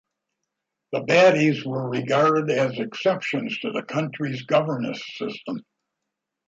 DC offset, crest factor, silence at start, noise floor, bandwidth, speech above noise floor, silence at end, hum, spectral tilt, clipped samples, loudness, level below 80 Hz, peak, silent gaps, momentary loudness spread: under 0.1%; 20 dB; 0.9 s; -83 dBFS; 7.8 kHz; 60 dB; 0.85 s; none; -6 dB/octave; under 0.1%; -23 LUFS; -70 dBFS; -4 dBFS; none; 14 LU